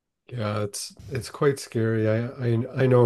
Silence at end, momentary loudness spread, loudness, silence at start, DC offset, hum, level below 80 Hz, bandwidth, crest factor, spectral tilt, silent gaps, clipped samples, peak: 0 s; 10 LU; -26 LUFS; 0.3 s; under 0.1%; none; -60 dBFS; 12.5 kHz; 18 dB; -6.5 dB/octave; none; under 0.1%; -6 dBFS